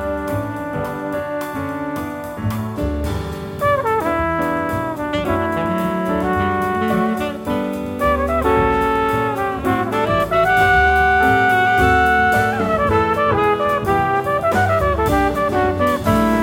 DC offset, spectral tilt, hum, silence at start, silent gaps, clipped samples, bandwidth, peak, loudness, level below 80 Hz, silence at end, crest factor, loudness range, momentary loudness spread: under 0.1%; -6 dB/octave; none; 0 s; none; under 0.1%; 17 kHz; -2 dBFS; -18 LUFS; -32 dBFS; 0 s; 16 dB; 7 LU; 10 LU